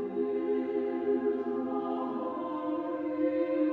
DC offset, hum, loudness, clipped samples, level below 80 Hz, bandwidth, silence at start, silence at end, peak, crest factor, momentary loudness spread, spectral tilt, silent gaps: under 0.1%; none; -32 LUFS; under 0.1%; -78 dBFS; 4.7 kHz; 0 s; 0 s; -18 dBFS; 14 dB; 5 LU; -8.5 dB/octave; none